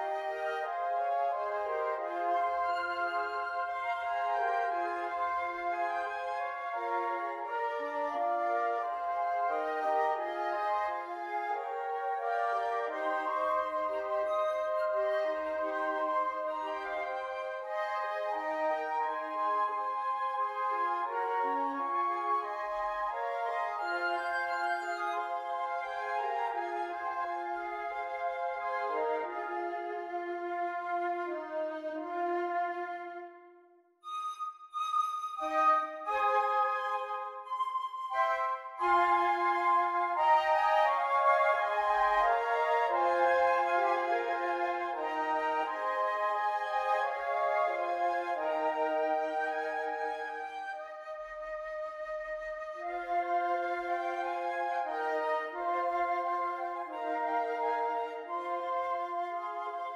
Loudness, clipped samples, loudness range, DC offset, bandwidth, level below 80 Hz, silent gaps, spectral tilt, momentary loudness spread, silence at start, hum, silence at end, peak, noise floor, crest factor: -33 LUFS; under 0.1%; 7 LU; under 0.1%; 12 kHz; -70 dBFS; none; -3 dB/octave; 9 LU; 0 s; none; 0 s; -16 dBFS; -62 dBFS; 18 dB